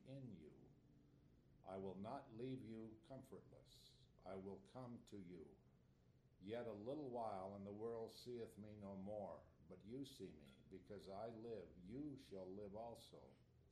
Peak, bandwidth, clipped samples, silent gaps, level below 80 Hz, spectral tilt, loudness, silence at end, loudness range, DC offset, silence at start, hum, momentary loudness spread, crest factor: -38 dBFS; 13 kHz; under 0.1%; none; -78 dBFS; -7 dB/octave; -55 LUFS; 0 s; 6 LU; under 0.1%; 0 s; none; 13 LU; 18 dB